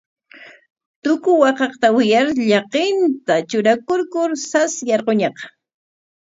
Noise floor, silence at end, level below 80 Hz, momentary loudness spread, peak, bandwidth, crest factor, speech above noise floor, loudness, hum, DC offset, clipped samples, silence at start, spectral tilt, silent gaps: -44 dBFS; 0.85 s; -68 dBFS; 6 LU; 0 dBFS; 8 kHz; 18 dB; 27 dB; -17 LUFS; none; under 0.1%; under 0.1%; 0.4 s; -4 dB/octave; 0.70-0.76 s, 0.86-1.02 s